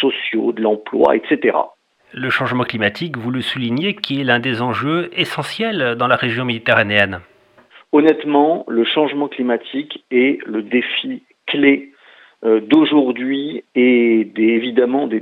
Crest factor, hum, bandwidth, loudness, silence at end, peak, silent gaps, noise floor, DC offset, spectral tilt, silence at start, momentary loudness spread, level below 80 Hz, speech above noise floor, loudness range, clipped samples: 16 dB; none; 11 kHz; -17 LUFS; 0 s; 0 dBFS; none; -48 dBFS; under 0.1%; -6.5 dB/octave; 0 s; 8 LU; -64 dBFS; 32 dB; 3 LU; under 0.1%